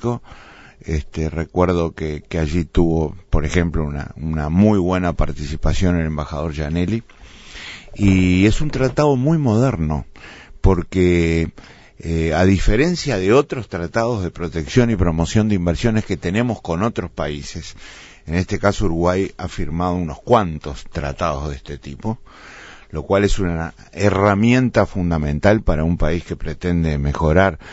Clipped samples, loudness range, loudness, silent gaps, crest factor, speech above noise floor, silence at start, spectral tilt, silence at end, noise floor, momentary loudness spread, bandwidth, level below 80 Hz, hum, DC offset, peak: under 0.1%; 5 LU; -19 LUFS; none; 18 dB; 19 dB; 0 s; -7 dB/octave; 0 s; -37 dBFS; 14 LU; 8 kHz; -28 dBFS; none; under 0.1%; -2 dBFS